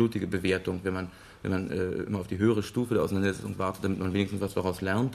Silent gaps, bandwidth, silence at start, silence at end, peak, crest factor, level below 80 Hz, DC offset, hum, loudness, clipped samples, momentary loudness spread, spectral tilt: none; 13.5 kHz; 0 s; 0 s; -12 dBFS; 16 dB; -58 dBFS; under 0.1%; none; -30 LUFS; under 0.1%; 6 LU; -6.5 dB/octave